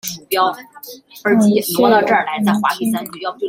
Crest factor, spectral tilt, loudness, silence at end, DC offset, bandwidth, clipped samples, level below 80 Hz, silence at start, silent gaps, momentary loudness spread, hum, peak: 16 dB; -4.5 dB/octave; -16 LUFS; 0 s; under 0.1%; 16.5 kHz; under 0.1%; -62 dBFS; 0.05 s; none; 19 LU; none; -2 dBFS